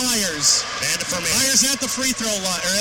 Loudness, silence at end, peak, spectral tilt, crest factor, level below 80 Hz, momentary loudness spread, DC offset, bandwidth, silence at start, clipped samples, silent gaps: -18 LUFS; 0 s; -4 dBFS; -0.5 dB/octave; 16 dB; -50 dBFS; 6 LU; 0.2%; 16.5 kHz; 0 s; under 0.1%; none